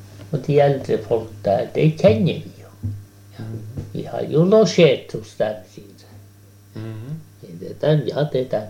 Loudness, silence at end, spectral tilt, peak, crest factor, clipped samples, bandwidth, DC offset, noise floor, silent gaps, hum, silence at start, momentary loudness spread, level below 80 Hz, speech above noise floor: -19 LUFS; 0 s; -7 dB/octave; -2 dBFS; 18 dB; under 0.1%; 15.5 kHz; under 0.1%; -47 dBFS; none; none; 0 s; 20 LU; -52 dBFS; 28 dB